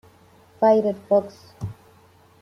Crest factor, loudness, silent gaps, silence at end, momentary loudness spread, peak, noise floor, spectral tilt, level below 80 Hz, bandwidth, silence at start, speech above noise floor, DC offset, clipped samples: 18 dB; -20 LUFS; none; 0.7 s; 18 LU; -6 dBFS; -54 dBFS; -8 dB/octave; -60 dBFS; 10.5 kHz; 0.6 s; 33 dB; under 0.1%; under 0.1%